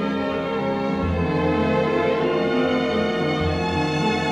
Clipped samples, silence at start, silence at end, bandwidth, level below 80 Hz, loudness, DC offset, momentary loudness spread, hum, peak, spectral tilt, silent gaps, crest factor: under 0.1%; 0 s; 0 s; 11 kHz; -40 dBFS; -22 LUFS; under 0.1%; 3 LU; none; -10 dBFS; -6.5 dB/octave; none; 12 dB